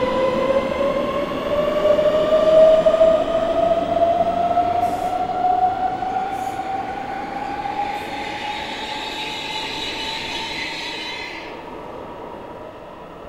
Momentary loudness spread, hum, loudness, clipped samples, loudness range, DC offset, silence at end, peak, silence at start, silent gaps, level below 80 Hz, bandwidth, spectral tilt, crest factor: 18 LU; none; -20 LUFS; under 0.1%; 10 LU; under 0.1%; 0 s; -2 dBFS; 0 s; none; -44 dBFS; 14.5 kHz; -4.5 dB/octave; 18 dB